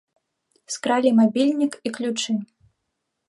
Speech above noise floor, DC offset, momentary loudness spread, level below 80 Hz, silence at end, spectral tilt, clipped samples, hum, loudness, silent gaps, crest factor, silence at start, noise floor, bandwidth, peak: 57 dB; under 0.1%; 11 LU; -76 dBFS; 0.85 s; -4.5 dB/octave; under 0.1%; none; -22 LUFS; none; 16 dB; 0.7 s; -78 dBFS; 11.5 kHz; -6 dBFS